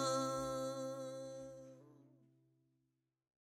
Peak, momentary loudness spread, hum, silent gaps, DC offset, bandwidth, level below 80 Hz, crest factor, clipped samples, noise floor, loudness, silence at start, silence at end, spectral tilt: -28 dBFS; 19 LU; none; none; under 0.1%; 16.5 kHz; -74 dBFS; 18 dB; under 0.1%; -86 dBFS; -43 LUFS; 0 s; 1.35 s; -4 dB/octave